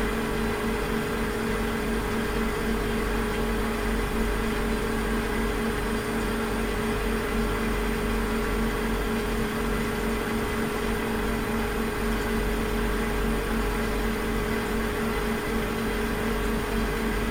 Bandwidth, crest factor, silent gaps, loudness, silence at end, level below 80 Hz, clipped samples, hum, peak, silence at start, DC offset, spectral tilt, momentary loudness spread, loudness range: over 20 kHz; 12 dB; none; -27 LUFS; 0 s; -32 dBFS; under 0.1%; 50 Hz at -40 dBFS; -14 dBFS; 0 s; under 0.1%; -5 dB/octave; 1 LU; 0 LU